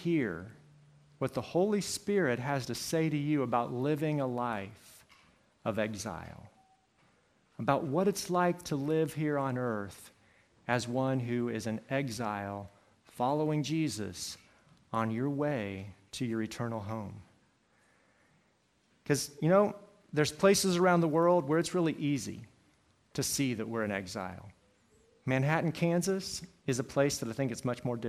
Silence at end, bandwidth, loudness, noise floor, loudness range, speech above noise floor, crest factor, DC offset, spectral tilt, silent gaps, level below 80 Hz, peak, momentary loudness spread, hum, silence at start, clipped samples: 0 s; 15.5 kHz; -32 LUFS; -71 dBFS; 8 LU; 40 dB; 22 dB; under 0.1%; -5.5 dB/octave; none; -68 dBFS; -12 dBFS; 15 LU; none; 0 s; under 0.1%